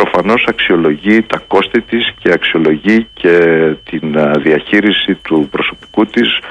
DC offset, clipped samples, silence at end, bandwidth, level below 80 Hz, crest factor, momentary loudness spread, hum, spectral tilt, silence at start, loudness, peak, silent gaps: under 0.1%; under 0.1%; 0 s; 9.6 kHz; -44 dBFS; 12 dB; 5 LU; none; -6.5 dB/octave; 0 s; -11 LUFS; 0 dBFS; none